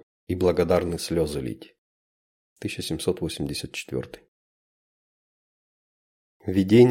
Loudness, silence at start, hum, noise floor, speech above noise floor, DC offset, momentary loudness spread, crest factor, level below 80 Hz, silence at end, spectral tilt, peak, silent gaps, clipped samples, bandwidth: -26 LUFS; 0.3 s; none; under -90 dBFS; over 67 dB; under 0.1%; 15 LU; 22 dB; -50 dBFS; 0 s; -6 dB/octave; -4 dBFS; 1.78-2.56 s, 4.28-6.40 s; under 0.1%; 16.5 kHz